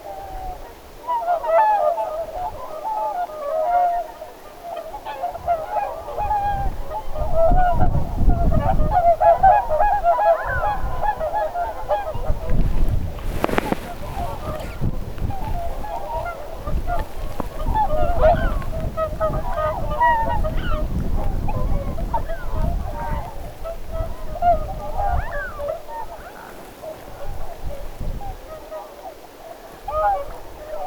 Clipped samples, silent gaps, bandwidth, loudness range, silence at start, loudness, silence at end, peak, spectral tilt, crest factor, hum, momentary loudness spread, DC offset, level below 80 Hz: under 0.1%; none; 20 kHz; 11 LU; 0 s; -23 LUFS; 0 s; 0 dBFS; -7 dB/octave; 20 dB; none; 17 LU; under 0.1%; -26 dBFS